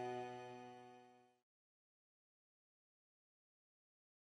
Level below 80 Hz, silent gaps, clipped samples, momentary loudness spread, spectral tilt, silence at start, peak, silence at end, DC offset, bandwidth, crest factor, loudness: under -90 dBFS; none; under 0.1%; 17 LU; -5.5 dB/octave; 0 s; -36 dBFS; 3.05 s; under 0.1%; 12 kHz; 20 dB; -53 LUFS